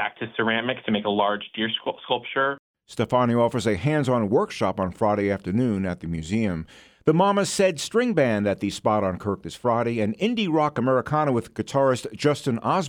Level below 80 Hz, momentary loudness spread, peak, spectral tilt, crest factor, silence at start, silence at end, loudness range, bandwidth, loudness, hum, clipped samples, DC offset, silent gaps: -54 dBFS; 7 LU; -6 dBFS; -5.5 dB/octave; 18 dB; 0 s; 0 s; 1 LU; 16.5 kHz; -24 LUFS; none; under 0.1%; under 0.1%; 2.59-2.74 s